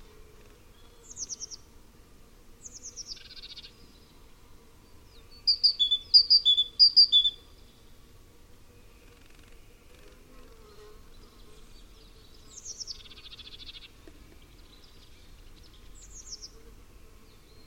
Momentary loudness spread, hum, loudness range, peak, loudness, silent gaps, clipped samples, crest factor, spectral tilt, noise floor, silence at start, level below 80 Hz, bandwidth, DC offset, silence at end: 29 LU; none; 25 LU; -8 dBFS; -20 LUFS; none; under 0.1%; 24 dB; 0 dB/octave; -53 dBFS; 1.15 s; -54 dBFS; 16.5 kHz; under 0.1%; 1.2 s